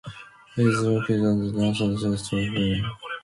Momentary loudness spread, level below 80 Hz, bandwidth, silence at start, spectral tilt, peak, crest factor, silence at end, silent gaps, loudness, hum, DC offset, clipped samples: 10 LU; -48 dBFS; 11.5 kHz; 0.05 s; -6.5 dB/octave; -8 dBFS; 16 dB; 0.05 s; none; -24 LUFS; none; under 0.1%; under 0.1%